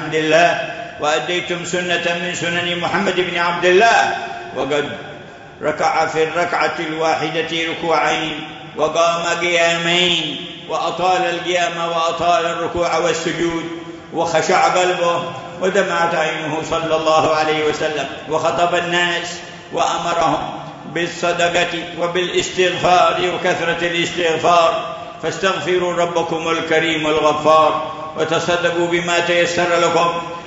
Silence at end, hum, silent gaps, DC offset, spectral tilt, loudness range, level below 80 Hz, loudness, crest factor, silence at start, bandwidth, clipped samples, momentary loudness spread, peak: 0 s; none; none; under 0.1%; -3.5 dB/octave; 3 LU; -52 dBFS; -17 LUFS; 18 dB; 0 s; 8 kHz; under 0.1%; 10 LU; 0 dBFS